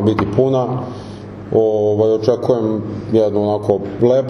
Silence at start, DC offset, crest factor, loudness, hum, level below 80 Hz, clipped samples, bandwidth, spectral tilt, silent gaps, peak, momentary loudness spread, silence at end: 0 s; under 0.1%; 16 dB; -16 LUFS; none; -46 dBFS; under 0.1%; 6.6 kHz; -8.5 dB/octave; none; 0 dBFS; 11 LU; 0 s